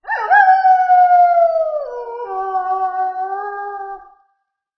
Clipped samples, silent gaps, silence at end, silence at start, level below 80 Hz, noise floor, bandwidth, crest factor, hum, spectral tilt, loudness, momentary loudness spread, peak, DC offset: under 0.1%; none; 0.8 s; 0.05 s; -60 dBFS; -69 dBFS; 5.8 kHz; 16 dB; none; -3 dB/octave; -14 LUFS; 16 LU; 0 dBFS; under 0.1%